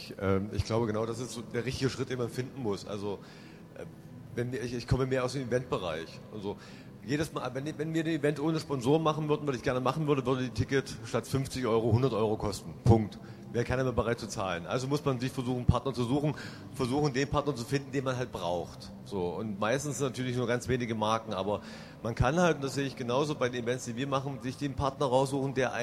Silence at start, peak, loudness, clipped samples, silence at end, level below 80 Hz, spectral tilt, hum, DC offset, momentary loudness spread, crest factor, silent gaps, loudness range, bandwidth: 0 s; -10 dBFS; -32 LUFS; under 0.1%; 0 s; -50 dBFS; -6 dB/octave; none; under 0.1%; 12 LU; 22 dB; none; 5 LU; 15.5 kHz